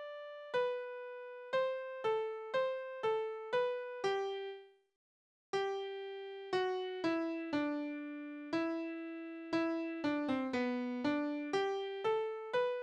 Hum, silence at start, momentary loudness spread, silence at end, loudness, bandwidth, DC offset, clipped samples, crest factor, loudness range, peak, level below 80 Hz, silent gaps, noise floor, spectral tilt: none; 0 s; 9 LU; 0 s; -38 LUFS; 9.8 kHz; under 0.1%; under 0.1%; 16 dB; 3 LU; -22 dBFS; -80 dBFS; 4.96-5.53 s; under -90 dBFS; -5 dB/octave